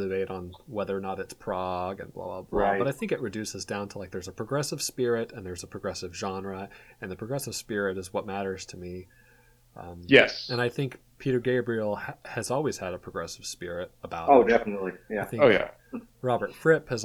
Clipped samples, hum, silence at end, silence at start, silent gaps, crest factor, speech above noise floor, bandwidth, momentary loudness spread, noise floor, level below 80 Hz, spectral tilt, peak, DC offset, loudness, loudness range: under 0.1%; none; 0 s; 0 s; none; 26 dB; 31 dB; 16 kHz; 17 LU; -59 dBFS; -56 dBFS; -4.5 dB/octave; -2 dBFS; under 0.1%; -28 LUFS; 8 LU